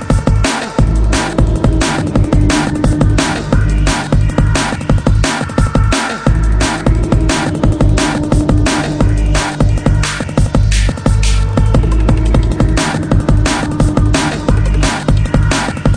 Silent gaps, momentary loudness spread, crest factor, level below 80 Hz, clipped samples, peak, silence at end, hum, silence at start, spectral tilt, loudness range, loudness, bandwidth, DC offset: none; 2 LU; 10 dB; -16 dBFS; under 0.1%; 0 dBFS; 0 s; none; 0 s; -5.5 dB/octave; 1 LU; -13 LUFS; 10.5 kHz; under 0.1%